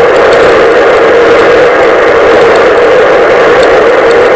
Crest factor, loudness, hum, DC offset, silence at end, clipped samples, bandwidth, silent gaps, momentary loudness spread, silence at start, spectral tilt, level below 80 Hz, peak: 4 dB; -4 LUFS; none; under 0.1%; 0 s; under 0.1%; 8 kHz; none; 1 LU; 0 s; -4.5 dB/octave; -32 dBFS; 0 dBFS